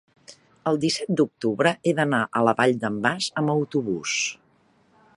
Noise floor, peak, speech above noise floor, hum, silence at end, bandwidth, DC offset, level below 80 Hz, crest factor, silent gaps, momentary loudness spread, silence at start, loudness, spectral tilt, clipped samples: -62 dBFS; -4 dBFS; 39 dB; none; 0.85 s; 11.5 kHz; under 0.1%; -66 dBFS; 20 dB; none; 5 LU; 0.3 s; -23 LUFS; -4.5 dB/octave; under 0.1%